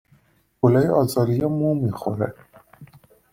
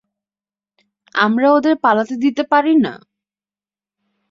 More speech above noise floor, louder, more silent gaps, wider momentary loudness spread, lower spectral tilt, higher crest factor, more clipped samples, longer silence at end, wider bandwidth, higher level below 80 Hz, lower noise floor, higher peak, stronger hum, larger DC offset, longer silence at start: second, 40 dB vs over 75 dB; second, -21 LUFS vs -15 LUFS; neither; first, 8 LU vs 5 LU; first, -8 dB/octave vs -6 dB/octave; about the same, 20 dB vs 16 dB; neither; second, 0.5 s vs 1.35 s; first, 16.5 kHz vs 7.4 kHz; first, -54 dBFS vs -66 dBFS; second, -60 dBFS vs under -90 dBFS; about the same, -2 dBFS vs -2 dBFS; neither; neither; second, 0.65 s vs 1.15 s